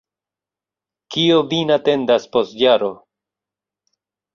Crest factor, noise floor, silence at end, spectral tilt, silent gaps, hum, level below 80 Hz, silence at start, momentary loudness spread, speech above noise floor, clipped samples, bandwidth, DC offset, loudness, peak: 18 dB; -89 dBFS; 1.4 s; -5.5 dB/octave; none; 50 Hz at -55 dBFS; -62 dBFS; 1.1 s; 6 LU; 73 dB; under 0.1%; 7.4 kHz; under 0.1%; -17 LUFS; -2 dBFS